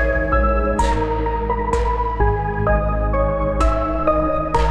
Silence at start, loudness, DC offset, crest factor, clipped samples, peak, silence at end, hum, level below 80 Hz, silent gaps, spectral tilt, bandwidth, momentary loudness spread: 0 s; -19 LUFS; 0.4%; 14 dB; under 0.1%; -4 dBFS; 0 s; none; -22 dBFS; none; -7 dB/octave; 9.8 kHz; 3 LU